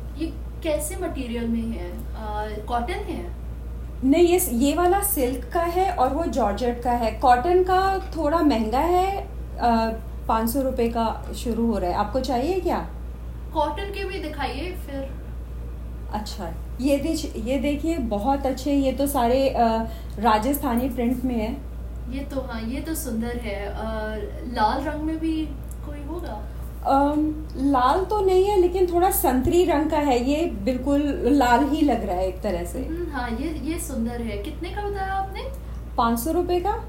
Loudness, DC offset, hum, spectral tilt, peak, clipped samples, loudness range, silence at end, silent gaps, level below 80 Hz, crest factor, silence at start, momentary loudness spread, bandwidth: -24 LUFS; under 0.1%; none; -5.5 dB/octave; -6 dBFS; under 0.1%; 8 LU; 0 s; none; -34 dBFS; 18 dB; 0 s; 13 LU; 16.5 kHz